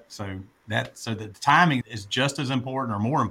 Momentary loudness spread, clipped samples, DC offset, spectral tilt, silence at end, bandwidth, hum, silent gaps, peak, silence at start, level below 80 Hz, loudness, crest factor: 17 LU; under 0.1%; under 0.1%; -5 dB/octave; 0 s; 15.5 kHz; none; none; -6 dBFS; 0.1 s; -64 dBFS; -24 LUFS; 20 dB